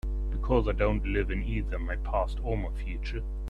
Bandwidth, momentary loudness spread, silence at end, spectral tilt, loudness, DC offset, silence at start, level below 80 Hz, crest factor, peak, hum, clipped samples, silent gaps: 5.6 kHz; 8 LU; 0 s; -8.5 dB/octave; -31 LUFS; under 0.1%; 0.05 s; -30 dBFS; 18 dB; -10 dBFS; none; under 0.1%; none